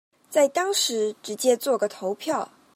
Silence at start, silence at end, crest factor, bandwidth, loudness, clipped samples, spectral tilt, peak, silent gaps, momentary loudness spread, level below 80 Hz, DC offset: 0.3 s; 0.3 s; 18 dB; 16 kHz; -24 LUFS; under 0.1%; -2 dB/octave; -8 dBFS; none; 7 LU; -84 dBFS; under 0.1%